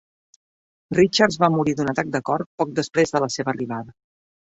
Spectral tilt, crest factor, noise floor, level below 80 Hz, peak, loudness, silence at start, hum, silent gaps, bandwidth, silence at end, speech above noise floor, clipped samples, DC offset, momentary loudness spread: -5 dB/octave; 20 dB; under -90 dBFS; -56 dBFS; -2 dBFS; -21 LUFS; 0.9 s; none; 2.46-2.58 s; 8.4 kHz; 0.7 s; over 69 dB; under 0.1%; under 0.1%; 10 LU